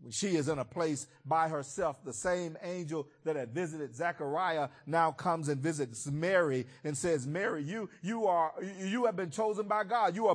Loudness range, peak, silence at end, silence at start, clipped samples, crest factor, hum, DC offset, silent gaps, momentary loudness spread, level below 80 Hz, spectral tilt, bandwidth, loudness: 3 LU; -16 dBFS; 0 s; 0 s; under 0.1%; 18 dB; none; under 0.1%; none; 8 LU; -70 dBFS; -5 dB/octave; 10.5 kHz; -33 LUFS